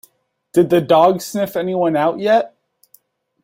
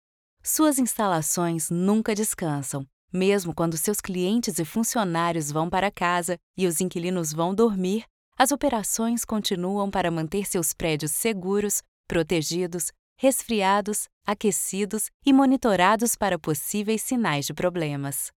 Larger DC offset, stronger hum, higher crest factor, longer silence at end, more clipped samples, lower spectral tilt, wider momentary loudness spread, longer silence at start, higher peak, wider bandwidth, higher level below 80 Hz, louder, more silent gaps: neither; neither; about the same, 16 dB vs 20 dB; first, 0.95 s vs 0.1 s; neither; first, -6 dB/octave vs -4 dB/octave; about the same, 8 LU vs 7 LU; about the same, 0.55 s vs 0.45 s; about the same, -2 dBFS vs -4 dBFS; second, 16.5 kHz vs 18.5 kHz; second, -60 dBFS vs -54 dBFS; first, -16 LUFS vs -24 LUFS; second, none vs 2.93-3.08 s, 6.43-6.54 s, 8.10-8.32 s, 11.88-12.04 s, 12.99-13.16 s, 14.13-14.21 s, 15.14-15.20 s